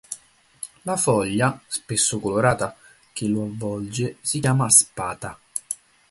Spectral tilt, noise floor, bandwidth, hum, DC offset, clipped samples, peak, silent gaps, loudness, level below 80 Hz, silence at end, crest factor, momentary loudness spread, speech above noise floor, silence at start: -4 dB/octave; -49 dBFS; 12 kHz; none; under 0.1%; under 0.1%; 0 dBFS; none; -22 LUFS; -54 dBFS; 0.35 s; 24 dB; 19 LU; 27 dB; 0.1 s